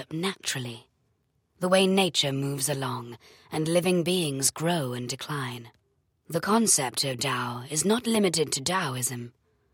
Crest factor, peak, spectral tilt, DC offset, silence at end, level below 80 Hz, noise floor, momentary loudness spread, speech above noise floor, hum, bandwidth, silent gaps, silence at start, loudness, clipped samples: 18 dB; -8 dBFS; -3.5 dB/octave; under 0.1%; 0.45 s; -68 dBFS; -72 dBFS; 13 LU; 45 dB; none; 17 kHz; none; 0 s; -26 LUFS; under 0.1%